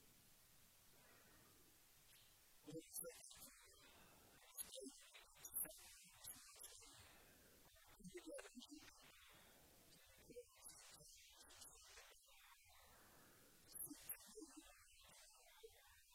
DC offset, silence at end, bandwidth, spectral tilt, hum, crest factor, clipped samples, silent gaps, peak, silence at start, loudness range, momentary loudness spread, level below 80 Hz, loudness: under 0.1%; 0 s; 16.5 kHz; -2 dB/octave; none; 26 dB; under 0.1%; none; -36 dBFS; 0 s; 8 LU; 16 LU; -80 dBFS; -59 LUFS